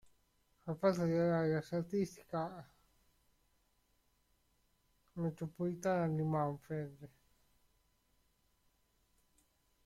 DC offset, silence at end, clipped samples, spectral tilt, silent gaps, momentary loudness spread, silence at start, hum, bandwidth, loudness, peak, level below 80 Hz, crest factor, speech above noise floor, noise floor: under 0.1%; 2.8 s; under 0.1%; -7.5 dB/octave; none; 13 LU; 0.65 s; none; 14 kHz; -38 LUFS; -20 dBFS; -72 dBFS; 22 dB; 40 dB; -77 dBFS